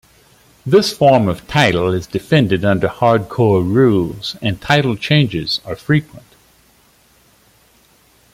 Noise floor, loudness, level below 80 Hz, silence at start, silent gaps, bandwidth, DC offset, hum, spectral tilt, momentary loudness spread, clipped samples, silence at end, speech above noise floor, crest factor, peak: -52 dBFS; -15 LUFS; -46 dBFS; 0.65 s; none; 15.5 kHz; under 0.1%; none; -6 dB/octave; 9 LU; under 0.1%; 2.15 s; 38 dB; 16 dB; 0 dBFS